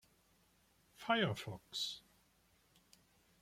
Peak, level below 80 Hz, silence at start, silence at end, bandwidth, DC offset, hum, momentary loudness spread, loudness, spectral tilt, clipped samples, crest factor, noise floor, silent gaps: -22 dBFS; -76 dBFS; 1 s; 1.4 s; 16.5 kHz; under 0.1%; none; 14 LU; -40 LUFS; -4 dB/octave; under 0.1%; 22 dB; -74 dBFS; none